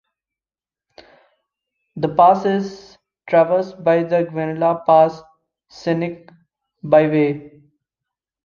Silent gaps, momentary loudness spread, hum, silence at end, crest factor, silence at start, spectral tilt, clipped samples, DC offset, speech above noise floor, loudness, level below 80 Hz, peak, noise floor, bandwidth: none; 17 LU; none; 0.95 s; 18 dB; 1.95 s; -8 dB/octave; under 0.1%; under 0.1%; over 73 dB; -17 LUFS; -62 dBFS; -2 dBFS; under -90 dBFS; 7 kHz